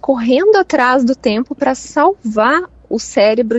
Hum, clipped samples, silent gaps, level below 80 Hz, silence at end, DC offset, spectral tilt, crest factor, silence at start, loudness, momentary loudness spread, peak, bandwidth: none; under 0.1%; none; -48 dBFS; 0 s; under 0.1%; -4.5 dB/octave; 14 dB; 0.05 s; -14 LUFS; 7 LU; 0 dBFS; 8.2 kHz